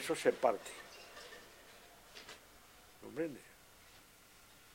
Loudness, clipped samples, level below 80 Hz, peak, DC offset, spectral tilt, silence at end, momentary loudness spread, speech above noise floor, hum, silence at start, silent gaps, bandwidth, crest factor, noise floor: -40 LUFS; under 0.1%; -74 dBFS; -16 dBFS; under 0.1%; -3.5 dB/octave; 0.75 s; 25 LU; 26 dB; none; 0 s; none; 16.5 kHz; 26 dB; -62 dBFS